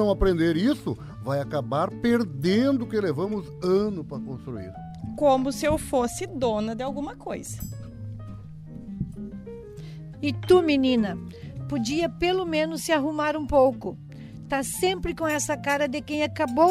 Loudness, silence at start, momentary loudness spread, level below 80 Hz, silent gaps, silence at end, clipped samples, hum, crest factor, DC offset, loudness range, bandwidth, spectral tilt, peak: -25 LUFS; 0 s; 17 LU; -44 dBFS; none; 0 s; under 0.1%; none; 20 dB; under 0.1%; 8 LU; 15 kHz; -5.5 dB/octave; -6 dBFS